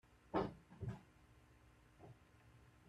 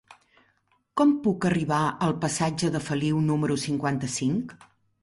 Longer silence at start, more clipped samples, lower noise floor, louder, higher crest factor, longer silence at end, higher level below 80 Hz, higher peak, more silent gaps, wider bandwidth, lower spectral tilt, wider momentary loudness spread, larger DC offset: about the same, 0.1 s vs 0.1 s; neither; about the same, -68 dBFS vs -68 dBFS; second, -47 LUFS vs -26 LUFS; first, 22 dB vs 16 dB; second, 0 s vs 0.5 s; second, -68 dBFS vs -58 dBFS; second, -28 dBFS vs -10 dBFS; neither; first, 13 kHz vs 11.5 kHz; first, -8 dB/octave vs -5.5 dB/octave; first, 25 LU vs 5 LU; neither